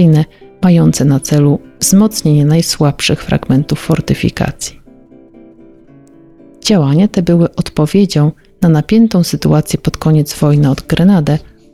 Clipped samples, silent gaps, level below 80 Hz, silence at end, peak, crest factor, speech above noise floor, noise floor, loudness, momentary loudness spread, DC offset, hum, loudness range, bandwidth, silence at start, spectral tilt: under 0.1%; none; -36 dBFS; 0.35 s; 0 dBFS; 10 dB; 30 dB; -40 dBFS; -12 LUFS; 6 LU; 0.2%; none; 6 LU; 15 kHz; 0 s; -6 dB/octave